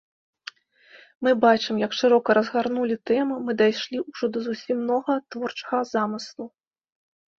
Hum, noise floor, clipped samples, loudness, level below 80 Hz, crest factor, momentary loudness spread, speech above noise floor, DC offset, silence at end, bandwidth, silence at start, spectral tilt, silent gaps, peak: none; -54 dBFS; under 0.1%; -24 LUFS; -68 dBFS; 20 dB; 18 LU; 31 dB; under 0.1%; 0.9 s; 7.4 kHz; 0.95 s; -5 dB/octave; 1.15-1.20 s; -4 dBFS